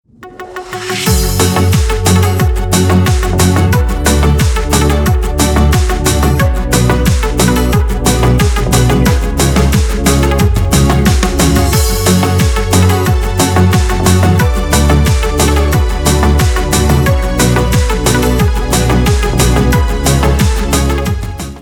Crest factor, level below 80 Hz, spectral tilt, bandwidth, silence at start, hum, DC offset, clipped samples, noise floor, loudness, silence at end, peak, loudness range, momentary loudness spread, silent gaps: 10 dB; -16 dBFS; -5 dB/octave; 18.5 kHz; 0.2 s; none; under 0.1%; under 0.1%; -30 dBFS; -11 LUFS; 0 s; 0 dBFS; 1 LU; 3 LU; none